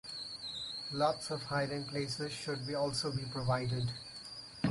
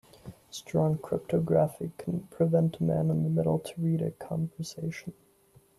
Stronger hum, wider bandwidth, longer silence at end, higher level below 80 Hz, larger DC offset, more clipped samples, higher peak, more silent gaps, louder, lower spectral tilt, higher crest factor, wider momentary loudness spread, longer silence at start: neither; about the same, 11.5 kHz vs 12.5 kHz; second, 0 s vs 0.65 s; about the same, -62 dBFS vs -62 dBFS; neither; neither; second, -18 dBFS vs -12 dBFS; neither; second, -37 LUFS vs -29 LUFS; second, -5 dB/octave vs -8 dB/octave; about the same, 18 dB vs 18 dB; second, 8 LU vs 16 LU; second, 0.05 s vs 0.25 s